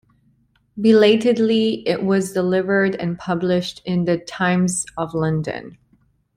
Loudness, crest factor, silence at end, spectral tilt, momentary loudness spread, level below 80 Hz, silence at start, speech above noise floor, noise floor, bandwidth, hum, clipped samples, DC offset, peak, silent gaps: -19 LUFS; 18 dB; 0.65 s; -5.5 dB/octave; 10 LU; -56 dBFS; 0.75 s; 42 dB; -61 dBFS; 14.5 kHz; none; under 0.1%; under 0.1%; -2 dBFS; none